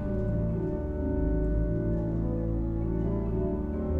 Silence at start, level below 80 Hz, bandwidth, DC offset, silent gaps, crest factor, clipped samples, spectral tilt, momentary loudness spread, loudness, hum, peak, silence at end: 0 s; -32 dBFS; 2.8 kHz; under 0.1%; none; 12 dB; under 0.1%; -12 dB/octave; 2 LU; -30 LUFS; none; -16 dBFS; 0 s